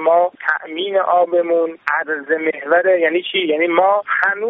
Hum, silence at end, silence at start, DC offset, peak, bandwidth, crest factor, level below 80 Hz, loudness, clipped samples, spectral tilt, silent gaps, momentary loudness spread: none; 0 s; 0 s; under 0.1%; 0 dBFS; 4.9 kHz; 16 dB; -74 dBFS; -17 LUFS; under 0.1%; 0 dB/octave; none; 5 LU